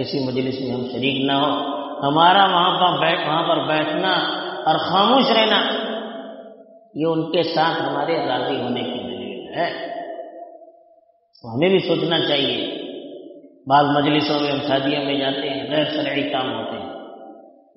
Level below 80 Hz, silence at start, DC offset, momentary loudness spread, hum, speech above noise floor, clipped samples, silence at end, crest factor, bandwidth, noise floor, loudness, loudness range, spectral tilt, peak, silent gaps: -64 dBFS; 0 s; under 0.1%; 17 LU; none; 37 dB; under 0.1%; 0.3 s; 20 dB; 6 kHz; -56 dBFS; -19 LUFS; 7 LU; -2.5 dB/octave; 0 dBFS; none